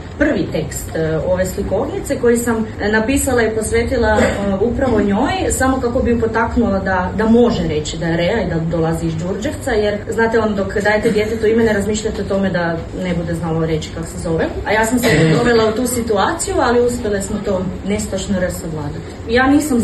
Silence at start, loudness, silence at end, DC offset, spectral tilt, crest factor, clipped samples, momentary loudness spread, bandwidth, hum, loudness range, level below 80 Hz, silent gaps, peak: 0 s; -16 LUFS; 0 s; under 0.1%; -5.5 dB/octave; 14 dB; under 0.1%; 8 LU; 13 kHz; none; 3 LU; -32 dBFS; none; -2 dBFS